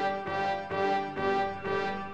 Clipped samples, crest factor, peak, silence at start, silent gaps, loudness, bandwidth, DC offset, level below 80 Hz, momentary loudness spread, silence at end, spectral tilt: under 0.1%; 16 dB; -16 dBFS; 0 s; none; -31 LUFS; 8.8 kHz; under 0.1%; -60 dBFS; 2 LU; 0 s; -6 dB/octave